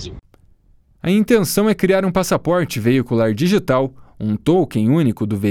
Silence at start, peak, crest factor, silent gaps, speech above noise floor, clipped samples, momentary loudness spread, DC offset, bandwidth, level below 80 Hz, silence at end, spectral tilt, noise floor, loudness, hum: 0 s; 0 dBFS; 16 dB; none; 37 dB; under 0.1%; 7 LU; under 0.1%; 17.5 kHz; -46 dBFS; 0 s; -6 dB/octave; -53 dBFS; -17 LUFS; none